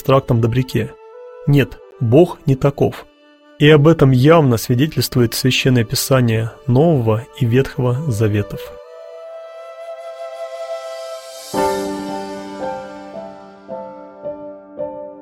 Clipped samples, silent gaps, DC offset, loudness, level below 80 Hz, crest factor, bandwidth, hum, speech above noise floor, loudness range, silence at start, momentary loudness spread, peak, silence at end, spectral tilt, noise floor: under 0.1%; none; under 0.1%; -16 LUFS; -44 dBFS; 16 dB; 16.5 kHz; none; 34 dB; 12 LU; 0.05 s; 22 LU; 0 dBFS; 0 s; -6.5 dB/octave; -48 dBFS